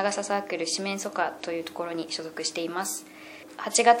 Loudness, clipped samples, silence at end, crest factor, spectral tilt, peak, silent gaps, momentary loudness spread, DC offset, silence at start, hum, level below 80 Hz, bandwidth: -29 LUFS; under 0.1%; 0 s; 24 dB; -2 dB/octave; -4 dBFS; none; 11 LU; under 0.1%; 0 s; none; -80 dBFS; 16.5 kHz